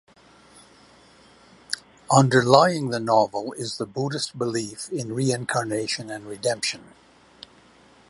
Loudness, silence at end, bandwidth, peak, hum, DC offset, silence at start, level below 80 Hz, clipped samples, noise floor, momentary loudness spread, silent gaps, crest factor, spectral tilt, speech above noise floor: -23 LUFS; 1.25 s; 11.5 kHz; 0 dBFS; none; under 0.1%; 1.7 s; -64 dBFS; under 0.1%; -54 dBFS; 15 LU; none; 24 dB; -4.5 dB/octave; 31 dB